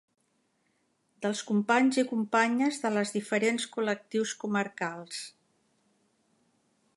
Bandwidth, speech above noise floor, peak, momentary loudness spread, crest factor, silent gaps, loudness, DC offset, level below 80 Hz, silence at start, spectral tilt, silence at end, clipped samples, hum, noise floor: 11.5 kHz; 45 dB; -10 dBFS; 11 LU; 22 dB; none; -29 LUFS; under 0.1%; -82 dBFS; 1.2 s; -4 dB/octave; 1.7 s; under 0.1%; none; -74 dBFS